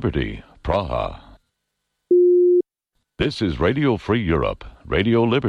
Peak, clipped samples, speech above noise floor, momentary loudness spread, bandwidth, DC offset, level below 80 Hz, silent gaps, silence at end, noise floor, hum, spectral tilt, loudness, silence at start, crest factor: -8 dBFS; under 0.1%; 56 dB; 14 LU; 6.6 kHz; under 0.1%; -36 dBFS; none; 0 s; -77 dBFS; none; -8 dB/octave; -20 LUFS; 0 s; 12 dB